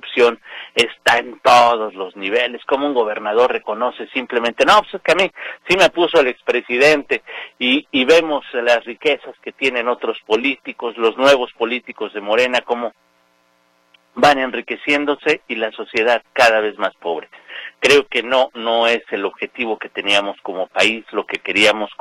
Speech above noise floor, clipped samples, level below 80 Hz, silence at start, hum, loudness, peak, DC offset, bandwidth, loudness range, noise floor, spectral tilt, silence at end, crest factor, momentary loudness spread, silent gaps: 42 dB; under 0.1%; -56 dBFS; 0.05 s; none; -17 LUFS; 0 dBFS; under 0.1%; 16 kHz; 4 LU; -59 dBFS; -3 dB/octave; 0.05 s; 18 dB; 11 LU; none